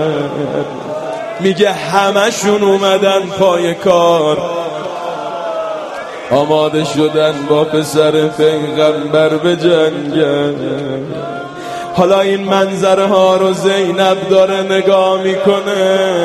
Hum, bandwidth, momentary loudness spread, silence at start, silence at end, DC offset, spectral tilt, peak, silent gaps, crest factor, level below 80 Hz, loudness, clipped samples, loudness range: none; 13.5 kHz; 10 LU; 0 s; 0 s; under 0.1%; -5 dB/octave; 0 dBFS; none; 12 dB; -54 dBFS; -13 LUFS; under 0.1%; 3 LU